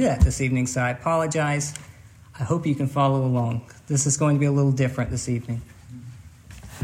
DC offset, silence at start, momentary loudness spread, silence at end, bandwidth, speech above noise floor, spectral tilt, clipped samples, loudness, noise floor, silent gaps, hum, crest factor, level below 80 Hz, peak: under 0.1%; 0 s; 21 LU; 0 s; 14.5 kHz; 21 dB; -5.5 dB/octave; under 0.1%; -23 LUFS; -44 dBFS; none; none; 18 dB; -36 dBFS; -4 dBFS